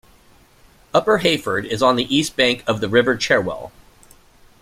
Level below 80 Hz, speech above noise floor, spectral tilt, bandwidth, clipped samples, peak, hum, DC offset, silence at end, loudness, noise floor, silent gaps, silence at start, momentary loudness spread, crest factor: -50 dBFS; 33 dB; -4 dB/octave; 16 kHz; under 0.1%; -2 dBFS; none; under 0.1%; 0.95 s; -18 LUFS; -51 dBFS; none; 0.95 s; 7 LU; 18 dB